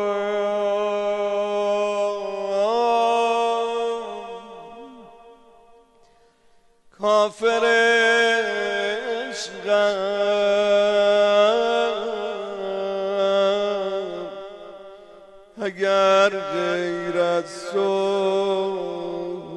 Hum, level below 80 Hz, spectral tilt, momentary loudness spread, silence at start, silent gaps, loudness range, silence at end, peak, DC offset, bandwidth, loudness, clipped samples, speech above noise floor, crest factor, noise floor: none; -66 dBFS; -3.5 dB/octave; 14 LU; 0 s; none; 6 LU; 0 s; -6 dBFS; under 0.1%; 11 kHz; -21 LUFS; under 0.1%; 36 dB; 16 dB; -56 dBFS